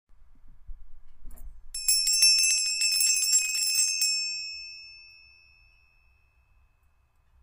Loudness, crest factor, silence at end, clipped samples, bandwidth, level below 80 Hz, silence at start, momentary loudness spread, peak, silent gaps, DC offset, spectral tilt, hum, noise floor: -22 LUFS; 22 dB; 2.4 s; under 0.1%; 16 kHz; -50 dBFS; 0.1 s; 20 LU; -8 dBFS; none; under 0.1%; 5 dB/octave; none; -65 dBFS